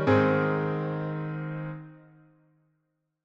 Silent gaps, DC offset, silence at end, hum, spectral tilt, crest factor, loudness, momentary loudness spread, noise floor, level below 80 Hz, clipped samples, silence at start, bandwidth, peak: none; under 0.1%; 1.25 s; none; -9 dB/octave; 18 dB; -28 LUFS; 17 LU; -78 dBFS; -64 dBFS; under 0.1%; 0 s; 6.8 kHz; -12 dBFS